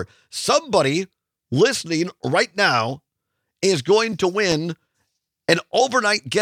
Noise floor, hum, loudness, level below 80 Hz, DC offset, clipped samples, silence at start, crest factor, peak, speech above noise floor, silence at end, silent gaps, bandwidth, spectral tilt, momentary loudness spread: -78 dBFS; none; -20 LUFS; -60 dBFS; under 0.1%; under 0.1%; 0 s; 20 dB; 0 dBFS; 58 dB; 0 s; none; 15.5 kHz; -4 dB/octave; 11 LU